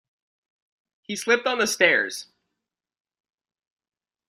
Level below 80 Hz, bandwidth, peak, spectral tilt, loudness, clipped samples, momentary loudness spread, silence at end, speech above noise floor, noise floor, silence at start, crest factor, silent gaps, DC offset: -74 dBFS; 16 kHz; -4 dBFS; -1.5 dB/octave; -21 LUFS; under 0.1%; 14 LU; 2.05 s; 63 dB; -85 dBFS; 1.1 s; 24 dB; none; under 0.1%